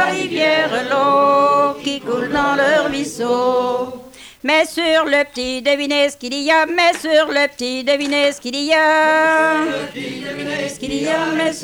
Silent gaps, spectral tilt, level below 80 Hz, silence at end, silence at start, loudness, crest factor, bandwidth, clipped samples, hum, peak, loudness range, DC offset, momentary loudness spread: none; -3 dB/octave; -52 dBFS; 0 s; 0 s; -16 LUFS; 14 dB; 18 kHz; under 0.1%; none; -4 dBFS; 2 LU; under 0.1%; 10 LU